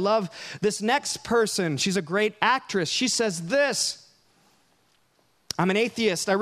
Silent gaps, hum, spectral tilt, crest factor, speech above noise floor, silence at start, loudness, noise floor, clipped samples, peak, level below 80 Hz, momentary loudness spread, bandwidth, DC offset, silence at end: none; none; -3.5 dB/octave; 22 dB; 42 dB; 0 s; -24 LUFS; -66 dBFS; under 0.1%; -4 dBFS; -64 dBFS; 5 LU; 15.5 kHz; under 0.1%; 0 s